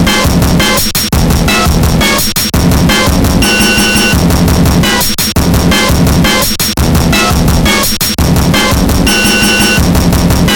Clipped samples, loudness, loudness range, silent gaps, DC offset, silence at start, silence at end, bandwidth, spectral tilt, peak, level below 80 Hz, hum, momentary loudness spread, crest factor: 0.1%; -8 LUFS; 1 LU; none; under 0.1%; 0 s; 0 s; 18.5 kHz; -4 dB/octave; 0 dBFS; -16 dBFS; none; 3 LU; 8 dB